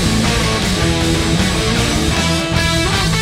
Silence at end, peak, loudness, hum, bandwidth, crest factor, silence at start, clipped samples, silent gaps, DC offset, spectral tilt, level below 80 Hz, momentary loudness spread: 0 s; 0 dBFS; -15 LUFS; none; 16 kHz; 14 dB; 0 s; under 0.1%; none; under 0.1%; -4 dB/octave; -24 dBFS; 1 LU